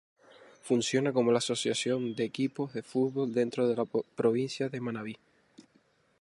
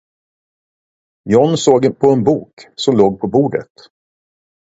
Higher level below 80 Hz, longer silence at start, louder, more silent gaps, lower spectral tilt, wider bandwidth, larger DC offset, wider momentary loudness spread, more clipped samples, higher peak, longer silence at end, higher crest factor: second, -76 dBFS vs -52 dBFS; second, 0.65 s vs 1.25 s; second, -30 LUFS vs -14 LUFS; second, none vs 2.53-2.57 s; about the same, -5 dB/octave vs -6 dB/octave; first, 11.5 kHz vs 8 kHz; neither; about the same, 10 LU vs 10 LU; neither; second, -14 dBFS vs 0 dBFS; second, 0.6 s vs 1.1 s; about the same, 18 dB vs 16 dB